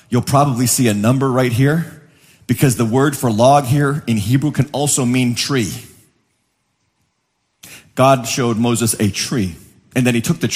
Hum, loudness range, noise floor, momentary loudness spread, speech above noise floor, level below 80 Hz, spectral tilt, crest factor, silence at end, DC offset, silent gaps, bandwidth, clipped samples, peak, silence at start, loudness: none; 5 LU; -68 dBFS; 8 LU; 53 dB; -50 dBFS; -5 dB/octave; 16 dB; 0 s; under 0.1%; none; 15.5 kHz; under 0.1%; 0 dBFS; 0.1 s; -16 LUFS